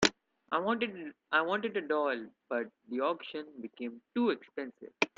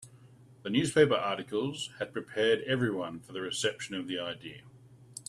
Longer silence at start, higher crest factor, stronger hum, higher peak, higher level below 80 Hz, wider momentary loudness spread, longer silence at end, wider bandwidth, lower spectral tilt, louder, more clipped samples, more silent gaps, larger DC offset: about the same, 0 s vs 0 s; first, 28 dB vs 22 dB; neither; first, -6 dBFS vs -10 dBFS; about the same, -70 dBFS vs -70 dBFS; second, 12 LU vs 17 LU; about the same, 0.1 s vs 0.05 s; second, 9.6 kHz vs 13 kHz; about the same, -3.5 dB/octave vs -4.5 dB/octave; second, -34 LUFS vs -31 LUFS; neither; neither; neither